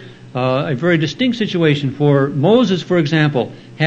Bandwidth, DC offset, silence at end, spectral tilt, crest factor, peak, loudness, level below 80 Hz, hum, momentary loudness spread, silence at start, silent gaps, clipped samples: 7.8 kHz; under 0.1%; 0 s; -7 dB/octave; 14 dB; 0 dBFS; -16 LUFS; -58 dBFS; none; 7 LU; 0 s; none; under 0.1%